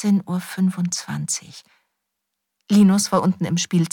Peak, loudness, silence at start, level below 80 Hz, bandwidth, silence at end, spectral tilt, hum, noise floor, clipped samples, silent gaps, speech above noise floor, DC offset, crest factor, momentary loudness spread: -4 dBFS; -20 LUFS; 0 s; -64 dBFS; 17 kHz; 0.05 s; -5 dB/octave; none; -79 dBFS; under 0.1%; none; 60 dB; under 0.1%; 16 dB; 10 LU